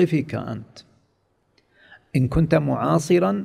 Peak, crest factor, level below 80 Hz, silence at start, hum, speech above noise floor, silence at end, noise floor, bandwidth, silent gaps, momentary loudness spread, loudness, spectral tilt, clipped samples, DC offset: -4 dBFS; 18 dB; -42 dBFS; 0 s; none; 46 dB; 0 s; -67 dBFS; 13 kHz; none; 12 LU; -21 LUFS; -7.5 dB/octave; under 0.1%; under 0.1%